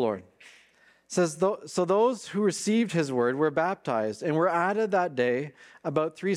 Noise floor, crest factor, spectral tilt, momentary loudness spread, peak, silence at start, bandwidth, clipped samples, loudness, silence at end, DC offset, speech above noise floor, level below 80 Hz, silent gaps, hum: -61 dBFS; 16 dB; -5.5 dB/octave; 6 LU; -12 dBFS; 0 s; 13.5 kHz; under 0.1%; -27 LUFS; 0 s; under 0.1%; 35 dB; -74 dBFS; none; none